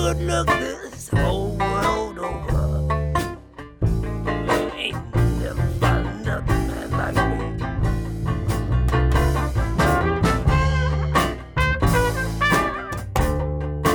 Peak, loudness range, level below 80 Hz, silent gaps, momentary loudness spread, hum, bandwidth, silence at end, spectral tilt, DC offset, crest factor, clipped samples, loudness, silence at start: -4 dBFS; 4 LU; -26 dBFS; none; 7 LU; none; over 20 kHz; 0 s; -6 dB/octave; under 0.1%; 16 dB; under 0.1%; -22 LUFS; 0 s